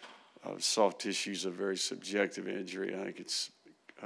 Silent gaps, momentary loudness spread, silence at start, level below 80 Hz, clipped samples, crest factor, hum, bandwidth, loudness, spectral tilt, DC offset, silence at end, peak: none; 12 LU; 0 s; under -90 dBFS; under 0.1%; 22 dB; none; 11 kHz; -34 LUFS; -2.5 dB/octave; under 0.1%; 0 s; -14 dBFS